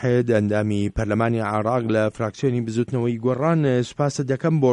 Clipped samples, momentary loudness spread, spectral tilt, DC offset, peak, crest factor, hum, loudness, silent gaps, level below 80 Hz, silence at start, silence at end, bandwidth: under 0.1%; 5 LU; -7.5 dB/octave; under 0.1%; -6 dBFS; 14 dB; none; -22 LUFS; none; -44 dBFS; 0 s; 0 s; 10.5 kHz